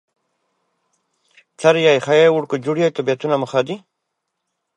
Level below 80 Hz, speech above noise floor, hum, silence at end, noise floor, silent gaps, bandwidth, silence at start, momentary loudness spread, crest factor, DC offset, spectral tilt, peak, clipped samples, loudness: -72 dBFS; 60 dB; none; 1 s; -76 dBFS; none; 9.4 kHz; 1.6 s; 8 LU; 18 dB; under 0.1%; -5.5 dB/octave; -2 dBFS; under 0.1%; -17 LUFS